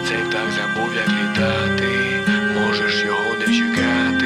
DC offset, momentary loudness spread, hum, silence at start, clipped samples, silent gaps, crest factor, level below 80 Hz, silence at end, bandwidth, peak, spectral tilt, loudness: under 0.1%; 3 LU; none; 0 s; under 0.1%; none; 14 dB; -50 dBFS; 0 s; 14.5 kHz; -6 dBFS; -4.5 dB/octave; -18 LUFS